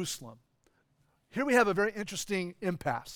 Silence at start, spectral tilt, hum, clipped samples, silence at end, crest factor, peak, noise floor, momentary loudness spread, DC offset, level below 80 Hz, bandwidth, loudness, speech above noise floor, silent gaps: 0 s; -4 dB/octave; none; under 0.1%; 0 s; 22 dB; -10 dBFS; -72 dBFS; 12 LU; under 0.1%; -64 dBFS; over 20 kHz; -31 LUFS; 40 dB; none